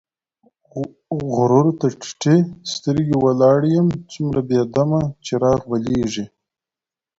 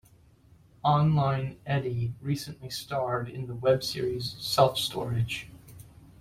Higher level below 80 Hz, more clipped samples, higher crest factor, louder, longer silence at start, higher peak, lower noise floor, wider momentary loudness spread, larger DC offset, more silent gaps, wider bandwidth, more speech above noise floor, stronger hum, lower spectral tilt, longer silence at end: first, -48 dBFS vs -56 dBFS; neither; second, 16 dB vs 22 dB; first, -19 LUFS vs -28 LUFS; about the same, 0.75 s vs 0.85 s; first, -2 dBFS vs -6 dBFS; first, -89 dBFS vs -58 dBFS; about the same, 12 LU vs 10 LU; neither; neither; second, 8 kHz vs 16 kHz; first, 72 dB vs 31 dB; neither; first, -7 dB/octave vs -5.5 dB/octave; first, 0.95 s vs 0.1 s